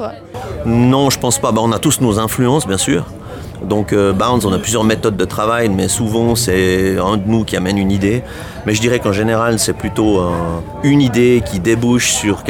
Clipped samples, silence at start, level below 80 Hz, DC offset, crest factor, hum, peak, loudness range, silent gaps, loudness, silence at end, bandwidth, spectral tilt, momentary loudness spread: under 0.1%; 0 s; -36 dBFS; under 0.1%; 12 dB; none; -2 dBFS; 1 LU; none; -14 LUFS; 0 s; 19.5 kHz; -5 dB/octave; 8 LU